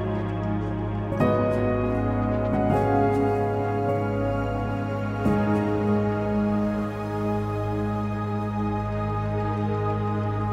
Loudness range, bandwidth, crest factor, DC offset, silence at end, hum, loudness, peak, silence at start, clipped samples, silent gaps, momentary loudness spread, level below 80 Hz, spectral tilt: 3 LU; 8 kHz; 16 dB; under 0.1%; 0 s; none; -25 LUFS; -8 dBFS; 0 s; under 0.1%; none; 6 LU; -40 dBFS; -9 dB/octave